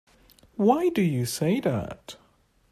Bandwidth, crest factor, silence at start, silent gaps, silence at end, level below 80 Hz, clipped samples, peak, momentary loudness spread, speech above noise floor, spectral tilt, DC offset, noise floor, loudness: 14.5 kHz; 20 dB; 0.6 s; none; 0.6 s; -58 dBFS; under 0.1%; -8 dBFS; 20 LU; 39 dB; -6 dB/octave; under 0.1%; -63 dBFS; -25 LUFS